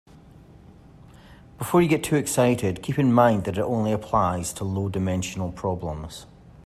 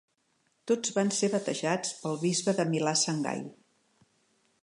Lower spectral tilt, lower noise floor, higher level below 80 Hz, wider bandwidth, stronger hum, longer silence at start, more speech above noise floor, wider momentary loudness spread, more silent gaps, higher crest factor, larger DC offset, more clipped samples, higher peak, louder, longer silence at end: first, -6 dB/octave vs -4 dB/octave; second, -49 dBFS vs -73 dBFS; first, -50 dBFS vs -80 dBFS; first, 15.5 kHz vs 11.5 kHz; neither; about the same, 0.7 s vs 0.65 s; second, 26 dB vs 44 dB; first, 12 LU vs 8 LU; neither; about the same, 18 dB vs 18 dB; neither; neither; first, -6 dBFS vs -12 dBFS; first, -23 LUFS vs -29 LUFS; second, 0.05 s vs 1.1 s